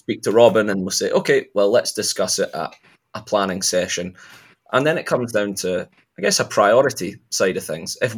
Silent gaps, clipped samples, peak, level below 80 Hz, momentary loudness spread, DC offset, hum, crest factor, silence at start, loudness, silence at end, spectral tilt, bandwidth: none; under 0.1%; 0 dBFS; -66 dBFS; 13 LU; under 0.1%; none; 20 dB; 0.1 s; -19 LUFS; 0 s; -3.5 dB/octave; 18 kHz